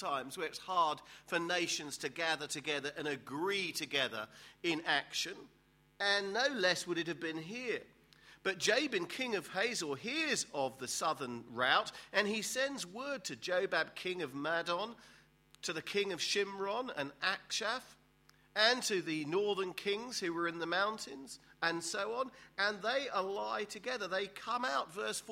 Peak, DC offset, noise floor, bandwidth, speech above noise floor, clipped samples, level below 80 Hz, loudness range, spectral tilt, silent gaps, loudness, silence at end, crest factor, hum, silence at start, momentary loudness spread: -14 dBFS; under 0.1%; -68 dBFS; 16 kHz; 31 dB; under 0.1%; -78 dBFS; 3 LU; -2 dB/octave; none; -36 LUFS; 0 s; 24 dB; none; 0 s; 9 LU